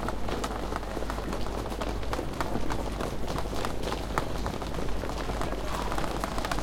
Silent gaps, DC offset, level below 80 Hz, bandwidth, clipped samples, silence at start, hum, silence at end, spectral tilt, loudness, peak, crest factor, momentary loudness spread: none; under 0.1%; -36 dBFS; 17 kHz; under 0.1%; 0 s; none; 0 s; -5 dB/octave; -33 LUFS; -8 dBFS; 22 dB; 2 LU